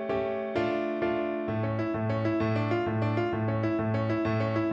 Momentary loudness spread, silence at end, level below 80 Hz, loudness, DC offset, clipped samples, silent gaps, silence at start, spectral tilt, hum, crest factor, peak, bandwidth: 2 LU; 0 s; -56 dBFS; -29 LUFS; under 0.1%; under 0.1%; none; 0 s; -9 dB/octave; none; 12 dB; -16 dBFS; 6.8 kHz